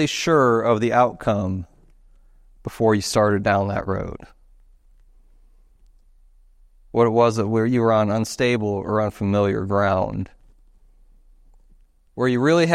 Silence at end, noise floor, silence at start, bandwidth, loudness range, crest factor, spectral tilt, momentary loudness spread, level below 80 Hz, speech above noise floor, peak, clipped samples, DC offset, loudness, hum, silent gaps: 0 s; -54 dBFS; 0 s; 14.5 kHz; 6 LU; 20 dB; -6 dB/octave; 14 LU; -48 dBFS; 34 dB; -2 dBFS; under 0.1%; under 0.1%; -20 LUFS; none; none